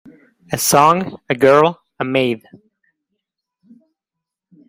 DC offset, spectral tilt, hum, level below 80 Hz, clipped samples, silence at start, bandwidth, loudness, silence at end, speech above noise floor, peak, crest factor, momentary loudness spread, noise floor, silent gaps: under 0.1%; -4 dB/octave; none; -58 dBFS; under 0.1%; 0.5 s; 16 kHz; -15 LUFS; 2.3 s; 68 dB; 0 dBFS; 18 dB; 14 LU; -83 dBFS; none